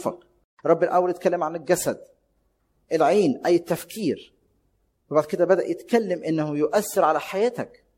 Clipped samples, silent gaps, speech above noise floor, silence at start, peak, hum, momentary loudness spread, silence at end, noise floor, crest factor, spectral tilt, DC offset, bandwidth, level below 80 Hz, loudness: under 0.1%; 0.44-0.57 s; 46 dB; 0 s; -6 dBFS; none; 9 LU; 0.3 s; -69 dBFS; 18 dB; -5.5 dB/octave; under 0.1%; 16.5 kHz; -66 dBFS; -23 LUFS